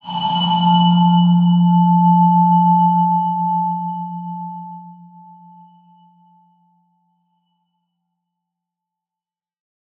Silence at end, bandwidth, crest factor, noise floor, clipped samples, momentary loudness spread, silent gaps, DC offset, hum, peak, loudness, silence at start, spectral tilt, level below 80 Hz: 5.05 s; 3.5 kHz; 14 dB; under -90 dBFS; under 0.1%; 16 LU; none; under 0.1%; none; -4 dBFS; -14 LUFS; 0.05 s; -10.5 dB/octave; -74 dBFS